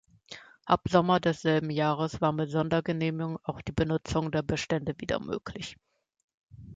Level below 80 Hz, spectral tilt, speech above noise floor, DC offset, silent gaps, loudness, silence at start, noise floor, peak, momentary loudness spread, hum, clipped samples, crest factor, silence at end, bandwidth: -52 dBFS; -6.5 dB/octave; 22 dB; under 0.1%; 6.24-6.28 s, 6.34-6.47 s; -29 LUFS; 0.3 s; -50 dBFS; -8 dBFS; 15 LU; none; under 0.1%; 22 dB; 0 s; 8 kHz